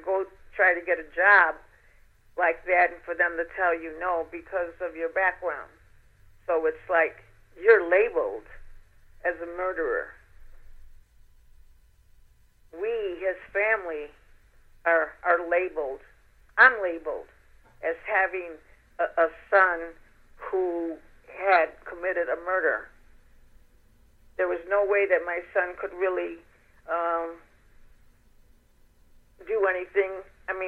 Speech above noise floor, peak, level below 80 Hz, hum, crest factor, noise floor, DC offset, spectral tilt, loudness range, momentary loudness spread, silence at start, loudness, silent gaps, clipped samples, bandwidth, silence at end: 33 dB; -4 dBFS; -56 dBFS; none; 24 dB; -59 dBFS; under 0.1%; -5.5 dB/octave; 10 LU; 16 LU; 0 s; -26 LUFS; none; under 0.1%; 4.9 kHz; 0 s